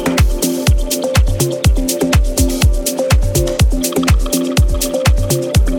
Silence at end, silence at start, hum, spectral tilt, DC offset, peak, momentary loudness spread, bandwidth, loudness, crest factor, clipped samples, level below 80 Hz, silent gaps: 0 s; 0 s; none; -5 dB/octave; under 0.1%; -2 dBFS; 2 LU; 19 kHz; -15 LUFS; 10 dB; under 0.1%; -16 dBFS; none